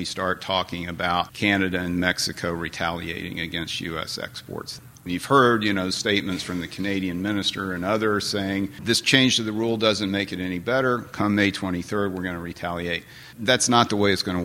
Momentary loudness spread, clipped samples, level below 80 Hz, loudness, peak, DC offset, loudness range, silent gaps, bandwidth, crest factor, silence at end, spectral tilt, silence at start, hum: 12 LU; under 0.1%; -54 dBFS; -23 LUFS; -2 dBFS; under 0.1%; 4 LU; none; 16.5 kHz; 22 dB; 0 s; -4 dB/octave; 0 s; none